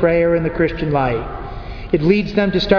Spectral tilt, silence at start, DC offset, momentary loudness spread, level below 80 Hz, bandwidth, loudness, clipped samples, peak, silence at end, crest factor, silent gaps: -8 dB/octave; 0 s; under 0.1%; 14 LU; -32 dBFS; 5.4 kHz; -17 LUFS; under 0.1%; 0 dBFS; 0 s; 16 dB; none